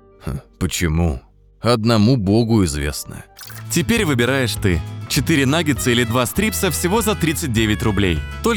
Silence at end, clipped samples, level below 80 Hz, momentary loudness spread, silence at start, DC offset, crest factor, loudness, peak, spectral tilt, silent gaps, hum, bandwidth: 0 s; under 0.1%; -34 dBFS; 13 LU; 0.25 s; under 0.1%; 16 dB; -18 LUFS; -2 dBFS; -5 dB/octave; none; none; over 20 kHz